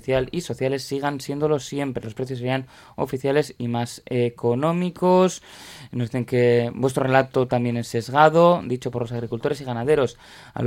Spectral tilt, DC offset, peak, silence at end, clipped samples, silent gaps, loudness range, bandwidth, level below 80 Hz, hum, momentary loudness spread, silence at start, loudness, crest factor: -6.5 dB/octave; under 0.1%; -2 dBFS; 0 s; under 0.1%; none; 6 LU; 16.5 kHz; -54 dBFS; none; 11 LU; 0.05 s; -22 LUFS; 20 dB